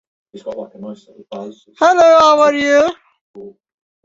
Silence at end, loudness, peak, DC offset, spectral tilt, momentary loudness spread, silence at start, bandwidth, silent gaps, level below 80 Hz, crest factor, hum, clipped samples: 0.55 s; -11 LUFS; 0 dBFS; under 0.1%; -3 dB/octave; 24 LU; 0.35 s; 7.8 kHz; 3.21-3.34 s; -56 dBFS; 14 dB; none; under 0.1%